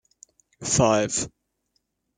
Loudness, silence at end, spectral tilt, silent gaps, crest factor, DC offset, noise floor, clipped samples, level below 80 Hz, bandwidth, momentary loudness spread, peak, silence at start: -22 LUFS; 0.9 s; -4 dB/octave; none; 22 dB; under 0.1%; -74 dBFS; under 0.1%; -54 dBFS; 10 kHz; 15 LU; -6 dBFS; 0.6 s